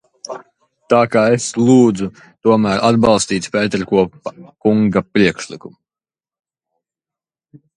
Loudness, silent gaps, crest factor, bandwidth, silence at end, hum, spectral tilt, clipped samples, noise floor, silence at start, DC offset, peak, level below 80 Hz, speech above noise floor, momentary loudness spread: -15 LUFS; none; 16 dB; 11 kHz; 2.05 s; none; -5.5 dB/octave; under 0.1%; under -90 dBFS; 0.3 s; under 0.1%; 0 dBFS; -50 dBFS; over 75 dB; 19 LU